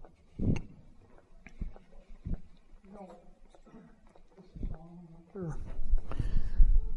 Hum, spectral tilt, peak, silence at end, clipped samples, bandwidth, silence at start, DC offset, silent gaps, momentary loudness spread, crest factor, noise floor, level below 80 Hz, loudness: none; -8.5 dB/octave; -8 dBFS; 0 s; under 0.1%; 3 kHz; 0 s; under 0.1%; none; 24 LU; 22 dB; -56 dBFS; -32 dBFS; -38 LUFS